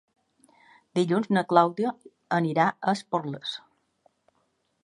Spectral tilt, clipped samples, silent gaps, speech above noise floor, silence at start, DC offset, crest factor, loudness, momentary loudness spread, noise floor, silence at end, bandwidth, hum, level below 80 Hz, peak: -6.5 dB/octave; under 0.1%; none; 47 dB; 0.95 s; under 0.1%; 24 dB; -26 LUFS; 13 LU; -72 dBFS; 1.25 s; 11.5 kHz; none; -76 dBFS; -4 dBFS